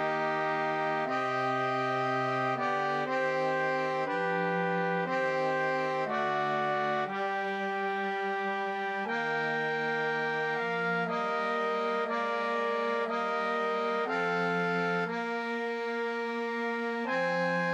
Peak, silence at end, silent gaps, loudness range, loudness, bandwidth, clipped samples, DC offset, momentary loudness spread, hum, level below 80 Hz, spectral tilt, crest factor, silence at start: -18 dBFS; 0 s; none; 1 LU; -30 LUFS; 10 kHz; under 0.1%; under 0.1%; 3 LU; none; -84 dBFS; -5.5 dB/octave; 12 dB; 0 s